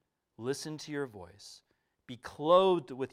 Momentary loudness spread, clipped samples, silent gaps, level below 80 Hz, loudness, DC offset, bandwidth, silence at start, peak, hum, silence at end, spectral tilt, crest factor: 25 LU; under 0.1%; none; -74 dBFS; -31 LUFS; under 0.1%; 14.5 kHz; 0.4 s; -12 dBFS; none; 0.05 s; -5 dB/octave; 22 dB